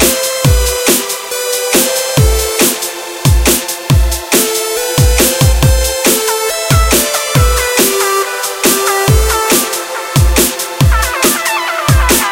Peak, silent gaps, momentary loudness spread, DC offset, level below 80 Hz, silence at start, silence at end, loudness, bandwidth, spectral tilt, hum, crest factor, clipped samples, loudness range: 0 dBFS; none; 5 LU; under 0.1%; -18 dBFS; 0 s; 0 s; -11 LUFS; 17.5 kHz; -3.5 dB/octave; none; 12 dB; under 0.1%; 1 LU